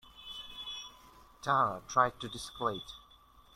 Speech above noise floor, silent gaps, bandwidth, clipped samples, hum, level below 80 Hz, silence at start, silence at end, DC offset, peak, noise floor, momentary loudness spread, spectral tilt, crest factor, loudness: 28 dB; none; 16 kHz; under 0.1%; none; -62 dBFS; 0.05 s; 0.55 s; under 0.1%; -12 dBFS; -61 dBFS; 17 LU; -3.5 dB/octave; 24 dB; -34 LUFS